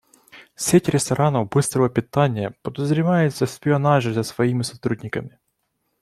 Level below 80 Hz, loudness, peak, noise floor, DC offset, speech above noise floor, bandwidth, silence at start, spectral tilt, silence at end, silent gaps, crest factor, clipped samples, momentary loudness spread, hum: -56 dBFS; -21 LUFS; -4 dBFS; -73 dBFS; under 0.1%; 53 dB; 14.5 kHz; 0.35 s; -6 dB/octave; 0.75 s; none; 18 dB; under 0.1%; 9 LU; none